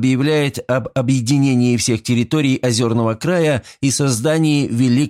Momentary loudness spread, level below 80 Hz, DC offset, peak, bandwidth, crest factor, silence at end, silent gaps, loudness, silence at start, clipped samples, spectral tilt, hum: 4 LU; -52 dBFS; under 0.1%; -4 dBFS; 15.5 kHz; 12 dB; 0 s; none; -17 LUFS; 0 s; under 0.1%; -5.5 dB/octave; none